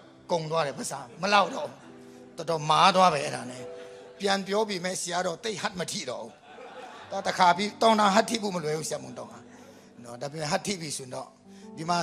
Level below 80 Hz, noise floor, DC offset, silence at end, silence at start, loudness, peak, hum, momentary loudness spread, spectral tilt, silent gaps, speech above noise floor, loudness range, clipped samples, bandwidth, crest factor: -70 dBFS; -50 dBFS; under 0.1%; 0 s; 0 s; -27 LUFS; -6 dBFS; none; 22 LU; -3.5 dB/octave; none; 23 dB; 6 LU; under 0.1%; 15.5 kHz; 22 dB